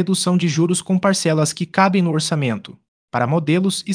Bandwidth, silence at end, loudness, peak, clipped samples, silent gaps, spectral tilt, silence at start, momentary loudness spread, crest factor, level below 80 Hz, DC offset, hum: 10.5 kHz; 0 s; -18 LUFS; 0 dBFS; under 0.1%; 2.88-3.08 s; -5 dB/octave; 0 s; 6 LU; 18 dB; -62 dBFS; under 0.1%; none